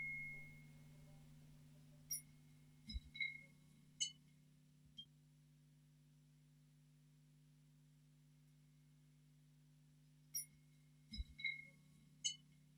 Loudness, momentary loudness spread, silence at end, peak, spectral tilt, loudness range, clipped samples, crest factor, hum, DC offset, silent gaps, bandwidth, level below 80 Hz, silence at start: -49 LUFS; 21 LU; 0 s; -28 dBFS; -1 dB/octave; 16 LU; under 0.1%; 28 dB; none; under 0.1%; none; over 20 kHz; -66 dBFS; 0 s